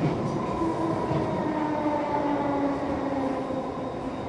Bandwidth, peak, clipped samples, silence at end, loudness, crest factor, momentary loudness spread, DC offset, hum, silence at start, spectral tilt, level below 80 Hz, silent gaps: 11 kHz; -14 dBFS; under 0.1%; 0 s; -28 LUFS; 12 dB; 5 LU; under 0.1%; none; 0 s; -7.5 dB/octave; -50 dBFS; none